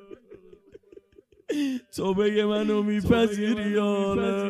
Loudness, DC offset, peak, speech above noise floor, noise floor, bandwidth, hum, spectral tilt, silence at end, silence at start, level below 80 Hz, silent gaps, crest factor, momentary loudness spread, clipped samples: -25 LUFS; under 0.1%; -8 dBFS; 33 dB; -57 dBFS; 14 kHz; none; -6.5 dB/octave; 0 s; 0.1 s; -50 dBFS; none; 18 dB; 7 LU; under 0.1%